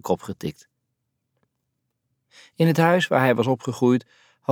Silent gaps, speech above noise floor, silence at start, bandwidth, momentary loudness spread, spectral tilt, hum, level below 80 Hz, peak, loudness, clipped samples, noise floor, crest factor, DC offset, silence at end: none; 56 dB; 0.05 s; 17.5 kHz; 15 LU; -6.5 dB/octave; none; -64 dBFS; -4 dBFS; -21 LUFS; under 0.1%; -77 dBFS; 20 dB; under 0.1%; 0 s